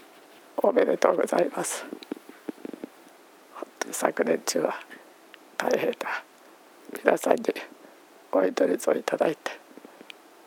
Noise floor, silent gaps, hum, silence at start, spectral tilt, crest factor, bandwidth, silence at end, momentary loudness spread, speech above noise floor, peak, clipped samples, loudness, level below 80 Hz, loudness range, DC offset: -53 dBFS; none; none; 0.55 s; -3.5 dB/octave; 24 dB; over 20 kHz; 0.9 s; 21 LU; 28 dB; -4 dBFS; under 0.1%; -26 LUFS; -90 dBFS; 4 LU; under 0.1%